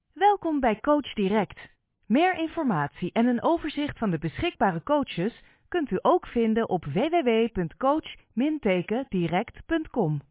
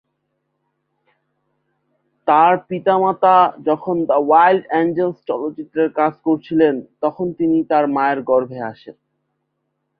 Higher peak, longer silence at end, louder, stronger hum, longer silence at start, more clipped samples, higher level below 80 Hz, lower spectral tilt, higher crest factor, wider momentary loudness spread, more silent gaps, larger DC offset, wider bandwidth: second, -10 dBFS vs -2 dBFS; second, 0.1 s vs 1.1 s; second, -26 LUFS vs -17 LUFS; neither; second, 0.15 s vs 2.25 s; neither; first, -52 dBFS vs -64 dBFS; about the same, -10.5 dB/octave vs -10.5 dB/octave; about the same, 16 dB vs 16 dB; second, 7 LU vs 11 LU; neither; neither; second, 4 kHz vs 5 kHz